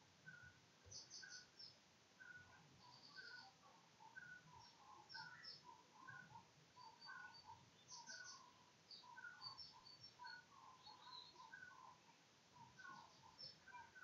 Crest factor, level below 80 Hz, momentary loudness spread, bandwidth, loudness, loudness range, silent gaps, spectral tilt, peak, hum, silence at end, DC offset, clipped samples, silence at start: 20 dB; under -90 dBFS; 10 LU; 7.4 kHz; -61 LUFS; 3 LU; none; 0 dB/octave; -42 dBFS; none; 0 s; under 0.1%; under 0.1%; 0 s